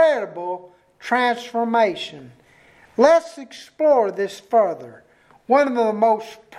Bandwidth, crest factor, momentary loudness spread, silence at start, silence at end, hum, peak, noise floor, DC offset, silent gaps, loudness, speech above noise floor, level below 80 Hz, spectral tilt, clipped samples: 12 kHz; 20 dB; 17 LU; 0 s; 0 s; none; 0 dBFS; -52 dBFS; under 0.1%; none; -20 LUFS; 32 dB; -68 dBFS; -4.5 dB/octave; under 0.1%